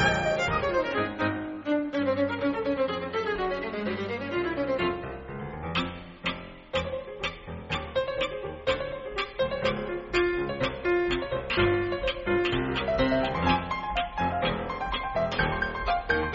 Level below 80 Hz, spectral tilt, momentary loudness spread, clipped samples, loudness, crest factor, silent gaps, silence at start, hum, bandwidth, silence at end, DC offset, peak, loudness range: -44 dBFS; -3.5 dB/octave; 8 LU; under 0.1%; -29 LUFS; 18 dB; none; 0 s; none; 7.6 kHz; 0 s; under 0.1%; -10 dBFS; 5 LU